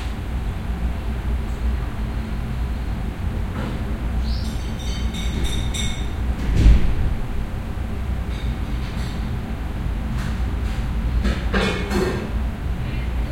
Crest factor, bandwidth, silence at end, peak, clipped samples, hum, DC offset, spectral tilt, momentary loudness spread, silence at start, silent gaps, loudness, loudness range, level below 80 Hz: 20 dB; 14 kHz; 0 s; -2 dBFS; under 0.1%; none; under 0.1%; -6 dB/octave; 6 LU; 0 s; none; -25 LUFS; 4 LU; -24 dBFS